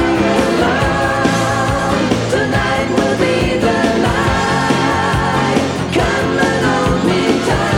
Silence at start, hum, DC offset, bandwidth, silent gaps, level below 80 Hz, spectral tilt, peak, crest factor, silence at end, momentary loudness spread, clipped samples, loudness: 0 s; none; under 0.1%; 17 kHz; none; -30 dBFS; -5 dB/octave; -2 dBFS; 12 dB; 0 s; 2 LU; under 0.1%; -14 LUFS